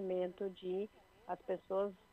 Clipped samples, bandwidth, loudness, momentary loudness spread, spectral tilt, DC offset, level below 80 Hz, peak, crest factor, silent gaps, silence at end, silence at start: under 0.1%; 11.5 kHz; -42 LUFS; 9 LU; -8 dB/octave; under 0.1%; -76 dBFS; -28 dBFS; 14 dB; none; 0.15 s; 0 s